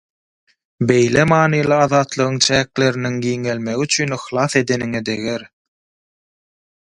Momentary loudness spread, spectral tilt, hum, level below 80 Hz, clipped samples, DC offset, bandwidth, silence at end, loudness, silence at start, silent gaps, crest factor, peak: 8 LU; -4.5 dB/octave; none; -50 dBFS; under 0.1%; under 0.1%; 11.5 kHz; 1.4 s; -17 LUFS; 0.8 s; none; 18 dB; 0 dBFS